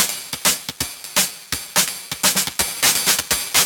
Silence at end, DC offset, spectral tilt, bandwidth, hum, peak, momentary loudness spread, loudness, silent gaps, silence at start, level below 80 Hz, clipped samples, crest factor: 0 s; under 0.1%; 0 dB/octave; 19 kHz; none; -2 dBFS; 7 LU; -18 LUFS; none; 0 s; -48 dBFS; under 0.1%; 18 dB